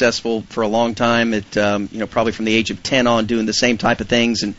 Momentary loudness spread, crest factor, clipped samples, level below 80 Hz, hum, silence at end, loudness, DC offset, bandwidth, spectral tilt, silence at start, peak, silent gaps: 5 LU; 16 dB; under 0.1%; -46 dBFS; none; 0.05 s; -18 LUFS; 0.5%; 8 kHz; -3 dB/octave; 0 s; -2 dBFS; none